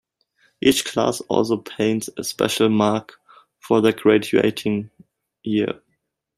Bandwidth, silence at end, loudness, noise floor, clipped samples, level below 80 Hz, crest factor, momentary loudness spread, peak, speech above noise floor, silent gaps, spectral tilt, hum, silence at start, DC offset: 15.5 kHz; 0.65 s; -20 LUFS; -73 dBFS; under 0.1%; -58 dBFS; 18 dB; 10 LU; -2 dBFS; 53 dB; none; -4.5 dB/octave; none; 0.65 s; under 0.1%